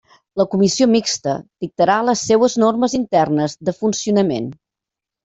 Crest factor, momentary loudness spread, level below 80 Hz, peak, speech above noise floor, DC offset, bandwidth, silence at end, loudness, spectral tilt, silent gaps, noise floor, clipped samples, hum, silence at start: 14 dB; 10 LU; -56 dBFS; -2 dBFS; 69 dB; under 0.1%; 8.2 kHz; 0.7 s; -17 LUFS; -4.5 dB/octave; none; -86 dBFS; under 0.1%; none; 0.35 s